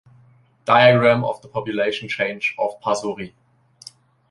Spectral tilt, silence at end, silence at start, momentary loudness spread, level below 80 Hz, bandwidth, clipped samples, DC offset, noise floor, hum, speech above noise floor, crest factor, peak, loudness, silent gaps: -5.5 dB/octave; 1.05 s; 0.65 s; 16 LU; -60 dBFS; 11.5 kHz; under 0.1%; under 0.1%; -54 dBFS; none; 35 dB; 20 dB; 0 dBFS; -19 LUFS; none